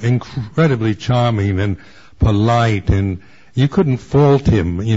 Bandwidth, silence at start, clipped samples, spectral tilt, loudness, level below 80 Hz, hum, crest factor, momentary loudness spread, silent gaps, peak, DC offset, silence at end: 7.8 kHz; 0 s; under 0.1%; -8 dB/octave; -16 LUFS; -30 dBFS; none; 14 dB; 10 LU; none; -2 dBFS; 0.7%; 0 s